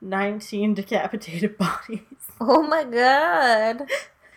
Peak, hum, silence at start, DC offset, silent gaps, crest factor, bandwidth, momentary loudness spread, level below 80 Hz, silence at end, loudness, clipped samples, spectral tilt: -4 dBFS; none; 0 s; under 0.1%; none; 18 dB; 18 kHz; 12 LU; -62 dBFS; 0.3 s; -22 LUFS; under 0.1%; -5 dB/octave